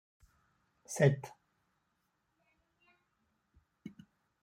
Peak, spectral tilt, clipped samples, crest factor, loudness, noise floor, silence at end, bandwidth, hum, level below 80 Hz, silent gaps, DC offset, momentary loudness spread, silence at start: -12 dBFS; -6.5 dB/octave; under 0.1%; 28 dB; -32 LUFS; -81 dBFS; 0.55 s; 15.5 kHz; none; -76 dBFS; none; under 0.1%; 24 LU; 0.9 s